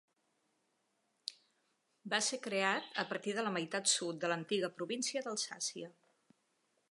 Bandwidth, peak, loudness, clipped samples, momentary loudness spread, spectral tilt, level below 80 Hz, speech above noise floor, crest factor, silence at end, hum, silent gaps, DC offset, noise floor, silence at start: 11.5 kHz; -16 dBFS; -36 LUFS; under 0.1%; 14 LU; -2 dB/octave; under -90 dBFS; 43 dB; 24 dB; 1 s; none; none; under 0.1%; -80 dBFS; 1.25 s